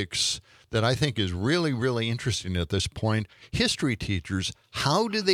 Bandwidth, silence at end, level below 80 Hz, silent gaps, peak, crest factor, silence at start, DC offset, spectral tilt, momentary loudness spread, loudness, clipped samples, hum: 15.5 kHz; 0 s; -50 dBFS; none; -8 dBFS; 20 dB; 0 s; under 0.1%; -4.5 dB/octave; 6 LU; -27 LUFS; under 0.1%; none